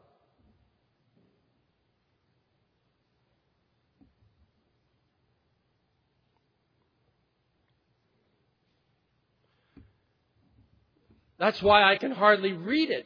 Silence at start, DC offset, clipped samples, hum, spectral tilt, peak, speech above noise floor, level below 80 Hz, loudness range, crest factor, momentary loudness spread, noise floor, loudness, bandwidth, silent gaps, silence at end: 11.4 s; under 0.1%; under 0.1%; none; -6 dB/octave; -6 dBFS; 50 dB; -66 dBFS; 11 LU; 26 dB; 9 LU; -74 dBFS; -23 LUFS; 5.4 kHz; none; 0.05 s